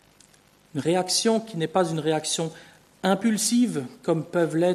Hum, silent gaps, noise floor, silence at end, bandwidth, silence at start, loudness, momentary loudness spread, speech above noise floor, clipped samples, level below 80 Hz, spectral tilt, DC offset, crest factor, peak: 50 Hz at -55 dBFS; none; -57 dBFS; 0 s; 13.5 kHz; 0.75 s; -24 LUFS; 7 LU; 34 dB; under 0.1%; -70 dBFS; -4 dB/octave; under 0.1%; 18 dB; -6 dBFS